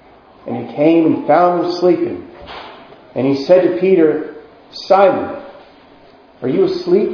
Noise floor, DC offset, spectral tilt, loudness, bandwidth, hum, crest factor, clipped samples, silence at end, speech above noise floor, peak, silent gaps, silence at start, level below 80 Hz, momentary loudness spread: -44 dBFS; under 0.1%; -7.5 dB/octave; -14 LUFS; 5.4 kHz; none; 16 dB; under 0.1%; 0 s; 31 dB; 0 dBFS; none; 0.45 s; -56 dBFS; 20 LU